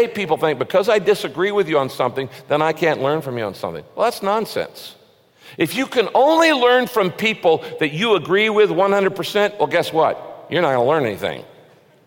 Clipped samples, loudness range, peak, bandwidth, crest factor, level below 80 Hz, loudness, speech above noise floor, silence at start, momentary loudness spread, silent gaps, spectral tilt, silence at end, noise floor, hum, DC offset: under 0.1%; 6 LU; -4 dBFS; 17 kHz; 16 dB; -64 dBFS; -18 LUFS; 31 dB; 0 s; 11 LU; none; -5 dB/octave; 0.65 s; -49 dBFS; none; under 0.1%